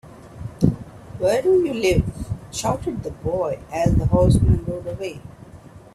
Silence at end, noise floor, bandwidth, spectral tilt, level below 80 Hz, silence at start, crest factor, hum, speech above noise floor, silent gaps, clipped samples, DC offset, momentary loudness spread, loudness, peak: 0.15 s; -43 dBFS; 13.5 kHz; -7 dB/octave; -32 dBFS; 0.05 s; 18 dB; none; 23 dB; none; under 0.1%; under 0.1%; 17 LU; -21 LUFS; -2 dBFS